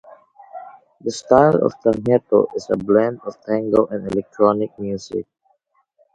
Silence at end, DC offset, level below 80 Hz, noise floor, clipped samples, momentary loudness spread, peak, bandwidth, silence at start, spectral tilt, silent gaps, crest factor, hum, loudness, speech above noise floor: 0.95 s; under 0.1%; -54 dBFS; -64 dBFS; under 0.1%; 15 LU; 0 dBFS; 9.2 kHz; 0.1 s; -7 dB/octave; none; 20 dB; none; -19 LUFS; 46 dB